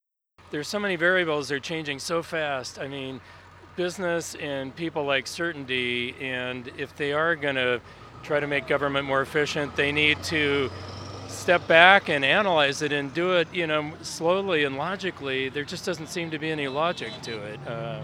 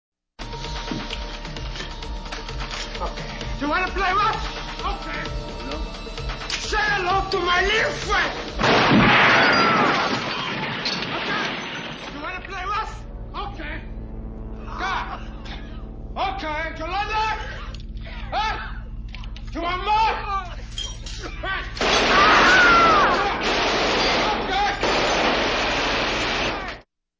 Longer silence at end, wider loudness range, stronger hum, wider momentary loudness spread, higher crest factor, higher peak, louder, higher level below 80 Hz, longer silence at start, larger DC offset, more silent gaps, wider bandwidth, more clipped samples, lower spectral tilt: second, 0 s vs 0.4 s; second, 9 LU vs 13 LU; neither; second, 13 LU vs 20 LU; first, 26 dB vs 18 dB; first, 0 dBFS vs -4 dBFS; second, -25 LUFS vs -21 LUFS; second, -60 dBFS vs -36 dBFS; about the same, 0.45 s vs 0.4 s; neither; neither; first, 16 kHz vs 8 kHz; neither; about the same, -4 dB/octave vs -3.5 dB/octave